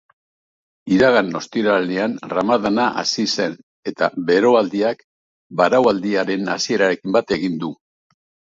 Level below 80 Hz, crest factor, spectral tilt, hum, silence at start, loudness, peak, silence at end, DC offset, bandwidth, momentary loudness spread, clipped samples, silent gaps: -58 dBFS; 18 dB; -4.5 dB/octave; none; 0.85 s; -18 LUFS; 0 dBFS; 0.75 s; under 0.1%; 7.8 kHz; 11 LU; under 0.1%; 3.63-3.83 s, 5.04-5.50 s